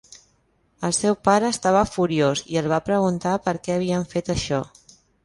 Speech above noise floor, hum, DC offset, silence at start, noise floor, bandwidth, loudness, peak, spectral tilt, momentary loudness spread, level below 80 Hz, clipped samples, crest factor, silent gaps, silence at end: 43 dB; none; under 0.1%; 0.8 s; -64 dBFS; 11.5 kHz; -22 LUFS; -4 dBFS; -5 dB/octave; 6 LU; -48 dBFS; under 0.1%; 18 dB; none; 0.6 s